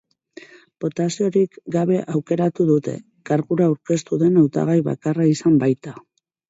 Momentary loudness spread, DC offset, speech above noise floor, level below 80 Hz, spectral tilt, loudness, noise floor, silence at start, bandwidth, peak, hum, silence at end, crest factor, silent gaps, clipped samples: 9 LU; under 0.1%; 26 dB; -62 dBFS; -7.5 dB/octave; -20 LUFS; -45 dBFS; 0.8 s; 8 kHz; -4 dBFS; none; 0.5 s; 16 dB; none; under 0.1%